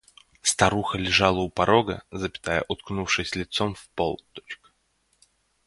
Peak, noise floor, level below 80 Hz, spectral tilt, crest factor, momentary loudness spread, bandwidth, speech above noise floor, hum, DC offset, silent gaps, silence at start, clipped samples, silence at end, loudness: -2 dBFS; -70 dBFS; -48 dBFS; -3.5 dB/octave; 24 dB; 15 LU; 11.5 kHz; 44 dB; none; under 0.1%; none; 0.45 s; under 0.1%; 1.1 s; -24 LUFS